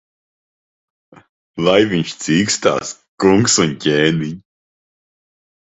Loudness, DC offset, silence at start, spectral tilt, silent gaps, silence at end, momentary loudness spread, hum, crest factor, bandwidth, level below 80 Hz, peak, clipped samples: -15 LUFS; under 0.1%; 1.55 s; -4 dB/octave; 3.08-3.18 s; 1.4 s; 14 LU; none; 18 dB; 8.4 kHz; -52 dBFS; 0 dBFS; under 0.1%